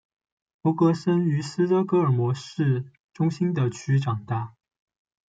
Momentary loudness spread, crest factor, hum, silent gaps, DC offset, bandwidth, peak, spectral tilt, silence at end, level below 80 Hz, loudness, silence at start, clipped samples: 8 LU; 16 dB; none; 3.00-3.09 s; under 0.1%; 9 kHz; -10 dBFS; -8 dB/octave; 0.8 s; -68 dBFS; -24 LUFS; 0.65 s; under 0.1%